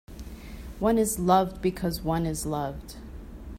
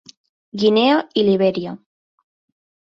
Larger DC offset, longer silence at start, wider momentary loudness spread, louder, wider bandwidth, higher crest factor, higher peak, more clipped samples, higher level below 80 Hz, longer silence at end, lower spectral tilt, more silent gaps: neither; second, 0.1 s vs 0.55 s; about the same, 20 LU vs 18 LU; second, -26 LUFS vs -17 LUFS; first, 16 kHz vs 7.6 kHz; about the same, 20 dB vs 16 dB; second, -8 dBFS vs -4 dBFS; neither; first, -42 dBFS vs -64 dBFS; second, 0 s vs 1.15 s; about the same, -5.5 dB/octave vs -6.5 dB/octave; neither